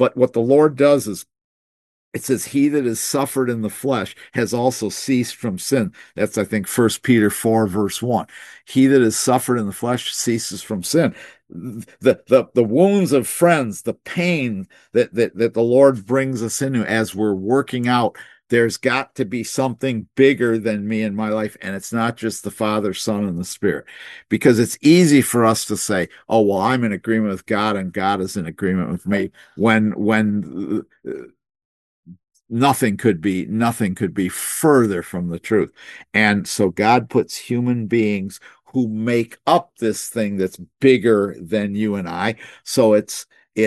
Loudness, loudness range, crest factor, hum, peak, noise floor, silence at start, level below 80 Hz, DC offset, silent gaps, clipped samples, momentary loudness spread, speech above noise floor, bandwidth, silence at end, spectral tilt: -19 LUFS; 4 LU; 18 dB; none; 0 dBFS; under -90 dBFS; 0 s; -62 dBFS; under 0.1%; 1.44-2.12 s, 31.65-32.03 s; under 0.1%; 11 LU; over 72 dB; 13 kHz; 0 s; -5 dB/octave